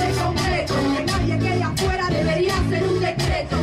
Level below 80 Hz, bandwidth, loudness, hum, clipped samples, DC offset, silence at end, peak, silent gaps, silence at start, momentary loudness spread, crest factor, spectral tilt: -32 dBFS; 15.5 kHz; -21 LUFS; none; under 0.1%; under 0.1%; 0 s; -10 dBFS; none; 0 s; 2 LU; 10 dB; -5.5 dB/octave